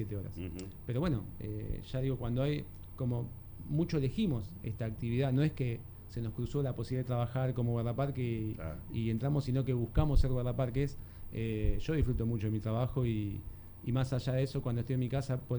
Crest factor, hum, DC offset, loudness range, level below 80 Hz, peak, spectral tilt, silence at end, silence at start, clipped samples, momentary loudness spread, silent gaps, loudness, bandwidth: 18 dB; none; under 0.1%; 2 LU; -42 dBFS; -14 dBFS; -8.5 dB/octave; 0 s; 0 s; under 0.1%; 10 LU; none; -35 LUFS; over 20 kHz